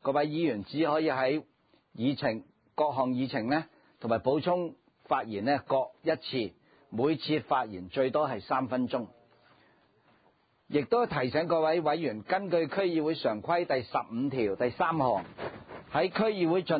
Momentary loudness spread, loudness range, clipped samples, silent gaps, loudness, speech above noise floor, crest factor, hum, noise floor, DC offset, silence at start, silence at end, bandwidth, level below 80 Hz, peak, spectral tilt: 8 LU; 3 LU; under 0.1%; none; -30 LUFS; 39 dB; 16 dB; none; -68 dBFS; under 0.1%; 0.05 s; 0 s; 5 kHz; -66 dBFS; -14 dBFS; -10 dB/octave